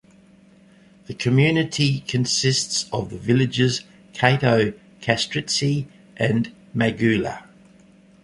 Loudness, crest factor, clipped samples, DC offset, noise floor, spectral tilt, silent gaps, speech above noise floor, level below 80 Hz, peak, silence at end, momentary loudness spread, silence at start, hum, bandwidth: -21 LUFS; 20 dB; under 0.1%; under 0.1%; -52 dBFS; -4.5 dB/octave; none; 31 dB; -54 dBFS; -2 dBFS; 0.8 s; 10 LU; 1.1 s; none; 11.5 kHz